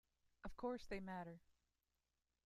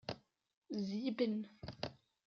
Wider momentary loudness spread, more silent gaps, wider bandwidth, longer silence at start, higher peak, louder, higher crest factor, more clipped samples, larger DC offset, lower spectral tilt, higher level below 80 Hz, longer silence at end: about the same, 12 LU vs 12 LU; second, none vs 0.57-0.62 s; first, 13.5 kHz vs 7 kHz; first, 0.45 s vs 0.1 s; second, -36 dBFS vs -24 dBFS; second, -51 LUFS vs -42 LUFS; about the same, 18 dB vs 18 dB; neither; neither; about the same, -6.5 dB/octave vs -5.5 dB/octave; about the same, -68 dBFS vs -72 dBFS; first, 0.95 s vs 0.3 s